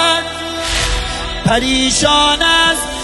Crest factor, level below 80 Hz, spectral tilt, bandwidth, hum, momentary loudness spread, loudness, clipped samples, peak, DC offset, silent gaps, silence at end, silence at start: 14 dB; -26 dBFS; -2.5 dB/octave; 12.5 kHz; none; 9 LU; -13 LUFS; under 0.1%; 0 dBFS; under 0.1%; none; 0 s; 0 s